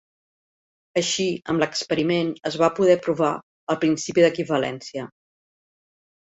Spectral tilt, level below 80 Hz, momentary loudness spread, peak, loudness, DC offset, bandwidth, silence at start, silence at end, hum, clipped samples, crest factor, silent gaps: -4.5 dB/octave; -64 dBFS; 12 LU; -4 dBFS; -22 LUFS; under 0.1%; 8.2 kHz; 0.95 s; 1.25 s; none; under 0.1%; 20 dB; 3.43-3.67 s